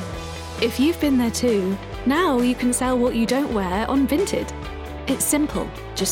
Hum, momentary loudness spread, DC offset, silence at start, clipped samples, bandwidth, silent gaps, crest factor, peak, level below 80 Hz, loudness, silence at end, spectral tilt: none; 11 LU; under 0.1%; 0 s; under 0.1%; 17.5 kHz; none; 12 dB; -8 dBFS; -38 dBFS; -21 LUFS; 0 s; -4 dB/octave